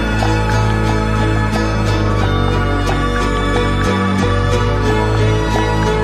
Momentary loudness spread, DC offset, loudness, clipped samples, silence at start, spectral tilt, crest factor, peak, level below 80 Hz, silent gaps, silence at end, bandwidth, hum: 2 LU; under 0.1%; -15 LUFS; under 0.1%; 0 s; -6 dB/octave; 14 dB; -2 dBFS; -20 dBFS; none; 0 s; 12.5 kHz; none